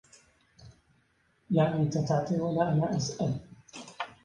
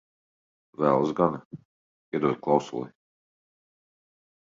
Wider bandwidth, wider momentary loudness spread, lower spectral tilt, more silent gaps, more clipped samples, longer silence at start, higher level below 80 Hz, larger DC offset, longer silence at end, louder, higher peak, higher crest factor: first, 9.8 kHz vs 7.6 kHz; about the same, 16 LU vs 16 LU; about the same, -6.5 dB/octave vs -7.5 dB/octave; second, none vs 1.45-1.51 s, 1.65-2.12 s; neither; second, 0.6 s vs 0.8 s; first, -62 dBFS vs -68 dBFS; neither; second, 0.15 s vs 1.55 s; second, -29 LUFS vs -26 LUFS; second, -12 dBFS vs -6 dBFS; second, 18 dB vs 24 dB